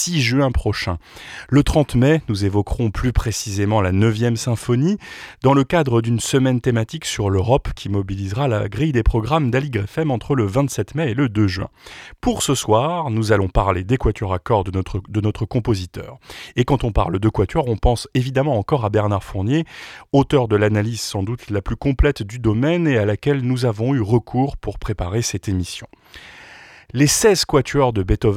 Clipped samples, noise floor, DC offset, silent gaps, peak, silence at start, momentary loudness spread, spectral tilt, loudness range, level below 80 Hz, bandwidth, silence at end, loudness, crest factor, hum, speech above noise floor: under 0.1%; -43 dBFS; under 0.1%; none; -4 dBFS; 0 s; 9 LU; -5.5 dB/octave; 3 LU; -32 dBFS; 16 kHz; 0 s; -19 LUFS; 16 dB; none; 24 dB